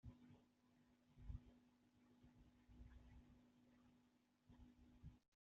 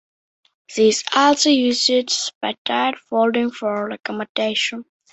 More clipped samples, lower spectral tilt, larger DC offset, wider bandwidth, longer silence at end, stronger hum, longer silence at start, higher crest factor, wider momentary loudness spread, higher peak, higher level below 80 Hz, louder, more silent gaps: neither; first, -7.5 dB/octave vs -2 dB/octave; neither; second, 6.6 kHz vs 8.4 kHz; about the same, 0.2 s vs 0.3 s; neither; second, 0.05 s vs 0.7 s; first, 24 dB vs 18 dB; about the same, 9 LU vs 10 LU; second, -42 dBFS vs -2 dBFS; about the same, -70 dBFS vs -66 dBFS; second, -65 LUFS vs -19 LUFS; second, 5.28-5.32 s vs 2.35-2.41 s, 2.58-2.65 s, 4.29-4.35 s